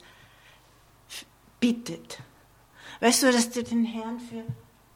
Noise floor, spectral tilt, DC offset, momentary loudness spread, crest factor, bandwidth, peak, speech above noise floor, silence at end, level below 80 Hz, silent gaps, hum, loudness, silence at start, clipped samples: -58 dBFS; -3 dB/octave; under 0.1%; 22 LU; 22 dB; 17 kHz; -8 dBFS; 32 dB; 0.35 s; -64 dBFS; none; 50 Hz at -65 dBFS; -26 LUFS; 1.1 s; under 0.1%